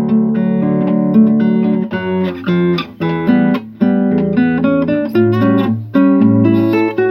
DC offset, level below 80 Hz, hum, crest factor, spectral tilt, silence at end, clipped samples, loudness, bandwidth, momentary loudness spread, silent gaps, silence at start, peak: under 0.1%; -50 dBFS; none; 12 dB; -10 dB/octave; 0 s; under 0.1%; -13 LUFS; 5.6 kHz; 6 LU; none; 0 s; 0 dBFS